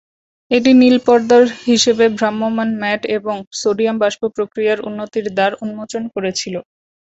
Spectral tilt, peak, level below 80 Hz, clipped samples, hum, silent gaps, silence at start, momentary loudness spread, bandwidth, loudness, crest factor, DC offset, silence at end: -4 dB/octave; -2 dBFS; -58 dBFS; under 0.1%; none; 3.47-3.51 s; 0.5 s; 13 LU; 8 kHz; -15 LUFS; 14 dB; under 0.1%; 0.4 s